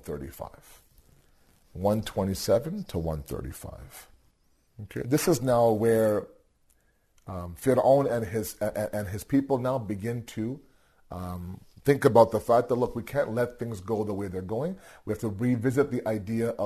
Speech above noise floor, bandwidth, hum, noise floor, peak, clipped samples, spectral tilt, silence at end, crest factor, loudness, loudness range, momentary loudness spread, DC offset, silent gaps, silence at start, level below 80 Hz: 39 dB; 13.5 kHz; none; -66 dBFS; -6 dBFS; under 0.1%; -6.5 dB/octave; 0 s; 22 dB; -27 LUFS; 5 LU; 19 LU; under 0.1%; none; 0.05 s; -54 dBFS